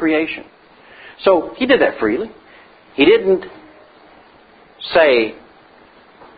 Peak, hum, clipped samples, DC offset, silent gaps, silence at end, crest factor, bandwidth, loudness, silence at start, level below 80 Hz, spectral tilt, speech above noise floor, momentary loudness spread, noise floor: 0 dBFS; none; under 0.1%; under 0.1%; none; 1.05 s; 18 dB; 5 kHz; -15 LUFS; 0 s; -52 dBFS; -9.5 dB/octave; 32 dB; 18 LU; -47 dBFS